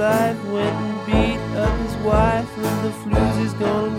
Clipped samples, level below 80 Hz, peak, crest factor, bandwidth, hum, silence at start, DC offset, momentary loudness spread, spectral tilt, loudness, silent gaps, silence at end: under 0.1%; -30 dBFS; -4 dBFS; 16 dB; 16.5 kHz; none; 0 s; under 0.1%; 5 LU; -6.5 dB/octave; -21 LUFS; none; 0 s